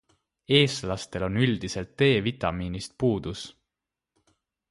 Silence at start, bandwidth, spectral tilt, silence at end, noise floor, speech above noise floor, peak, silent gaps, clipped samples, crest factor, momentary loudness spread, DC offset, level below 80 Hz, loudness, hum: 0.5 s; 11.5 kHz; -5.5 dB/octave; 1.2 s; -87 dBFS; 62 dB; -6 dBFS; none; under 0.1%; 22 dB; 13 LU; under 0.1%; -50 dBFS; -26 LUFS; none